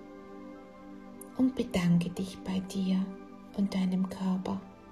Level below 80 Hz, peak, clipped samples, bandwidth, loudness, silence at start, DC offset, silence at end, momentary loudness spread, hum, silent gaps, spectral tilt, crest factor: -58 dBFS; -16 dBFS; under 0.1%; 13 kHz; -32 LUFS; 0 s; under 0.1%; 0 s; 20 LU; none; none; -7 dB/octave; 16 dB